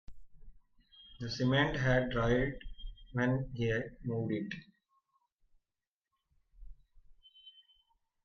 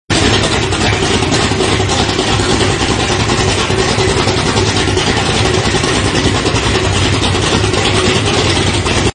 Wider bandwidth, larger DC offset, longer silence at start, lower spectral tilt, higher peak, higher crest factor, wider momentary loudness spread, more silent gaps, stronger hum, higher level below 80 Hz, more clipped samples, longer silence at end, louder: second, 6.8 kHz vs 10.5 kHz; neither; about the same, 0.1 s vs 0.1 s; first, -7 dB/octave vs -4 dB/octave; second, -16 dBFS vs 0 dBFS; first, 20 dB vs 12 dB; first, 18 LU vs 1 LU; first, 5.32-5.38 s, 5.87-6.01 s vs none; neither; second, -52 dBFS vs -26 dBFS; neither; first, 0.75 s vs 0 s; second, -34 LUFS vs -12 LUFS